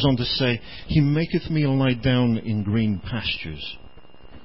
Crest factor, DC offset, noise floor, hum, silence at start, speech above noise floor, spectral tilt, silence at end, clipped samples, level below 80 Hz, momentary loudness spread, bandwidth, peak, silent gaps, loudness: 16 dB; 0.9%; -47 dBFS; none; 0 s; 25 dB; -11 dB/octave; 0.05 s; under 0.1%; -42 dBFS; 10 LU; 5.8 kHz; -8 dBFS; none; -23 LUFS